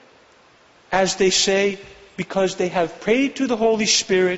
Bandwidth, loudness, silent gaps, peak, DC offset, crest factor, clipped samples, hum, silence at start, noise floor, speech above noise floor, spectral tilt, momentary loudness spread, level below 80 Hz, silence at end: 8.2 kHz; -19 LUFS; none; -6 dBFS; under 0.1%; 16 dB; under 0.1%; none; 0.9 s; -53 dBFS; 33 dB; -3 dB/octave; 9 LU; -54 dBFS; 0 s